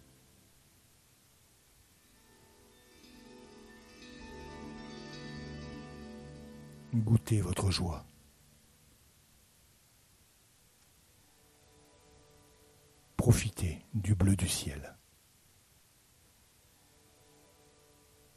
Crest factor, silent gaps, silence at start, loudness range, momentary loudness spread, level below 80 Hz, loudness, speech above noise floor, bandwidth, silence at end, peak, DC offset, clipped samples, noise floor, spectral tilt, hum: 26 dB; none; 3.15 s; 19 LU; 25 LU; -52 dBFS; -34 LUFS; 35 dB; 13 kHz; 3.45 s; -12 dBFS; under 0.1%; under 0.1%; -65 dBFS; -5.5 dB/octave; none